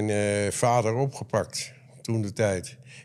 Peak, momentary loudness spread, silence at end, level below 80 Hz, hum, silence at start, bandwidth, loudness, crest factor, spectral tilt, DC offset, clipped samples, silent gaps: -8 dBFS; 13 LU; 0 s; -66 dBFS; none; 0 s; 14 kHz; -27 LUFS; 18 dB; -5 dB/octave; under 0.1%; under 0.1%; none